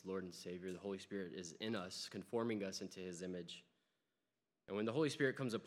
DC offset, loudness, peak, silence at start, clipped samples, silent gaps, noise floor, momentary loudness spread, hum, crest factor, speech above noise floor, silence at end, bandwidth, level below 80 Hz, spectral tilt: under 0.1%; -44 LUFS; -24 dBFS; 0.05 s; under 0.1%; none; under -90 dBFS; 10 LU; none; 20 dB; over 46 dB; 0 s; 15.5 kHz; -88 dBFS; -5 dB/octave